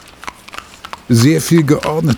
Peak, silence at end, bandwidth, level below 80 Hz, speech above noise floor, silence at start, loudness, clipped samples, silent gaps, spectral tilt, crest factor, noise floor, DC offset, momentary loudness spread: 0 dBFS; 0 s; 20 kHz; -44 dBFS; 22 dB; 0.25 s; -12 LUFS; under 0.1%; none; -6 dB/octave; 14 dB; -34 dBFS; under 0.1%; 21 LU